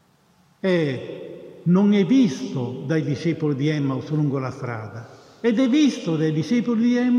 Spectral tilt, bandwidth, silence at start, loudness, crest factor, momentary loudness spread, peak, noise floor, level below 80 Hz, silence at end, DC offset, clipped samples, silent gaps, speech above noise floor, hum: -7 dB/octave; 9.8 kHz; 0.65 s; -22 LUFS; 14 dB; 14 LU; -8 dBFS; -59 dBFS; -68 dBFS; 0 s; under 0.1%; under 0.1%; none; 38 dB; none